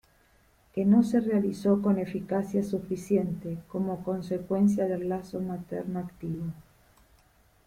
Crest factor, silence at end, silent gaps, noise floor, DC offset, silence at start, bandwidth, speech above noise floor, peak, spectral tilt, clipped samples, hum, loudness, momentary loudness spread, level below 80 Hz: 18 dB; 1.05 s; none; -63 dBFS; under 0.1%; 0.75 s; 14 kHz; 35 dB; -10 dBFS; -8.5 dB/octave; under 0.1%; none; -29 LUFS; 12 LU; -60 dBFS